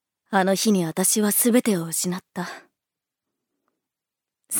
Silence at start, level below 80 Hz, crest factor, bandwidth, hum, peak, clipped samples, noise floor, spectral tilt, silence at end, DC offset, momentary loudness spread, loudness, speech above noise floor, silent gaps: 0.3 s; -76 dBFS; 20 dB; over 20 kHz; none; -4 dBFS; under 0.1%; -87 dBFS; -4 dB/octave; 0 s; under 0.1%; 14 LU; -21 LUFS; 65 dB; none